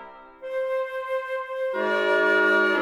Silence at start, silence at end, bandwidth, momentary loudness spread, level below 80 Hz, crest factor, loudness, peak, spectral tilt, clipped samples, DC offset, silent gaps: 0 s; 0 s; 13 kHz; 11 LU; -70 dBFS; 16 dB; -24 LUFS; -10 dBFS; -4 dB/octave; under 0.1%; under 0.1%; none